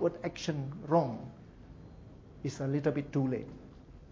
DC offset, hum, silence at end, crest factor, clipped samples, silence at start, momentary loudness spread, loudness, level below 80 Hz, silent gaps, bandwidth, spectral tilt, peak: under 0.1%; none; 0 s; 22 dB; under 0.1%; 0 s; 23 LU; -34 LUFS; -58 dBFS; none; 7.6 kHz; -7 dB/octave; -14 dBFS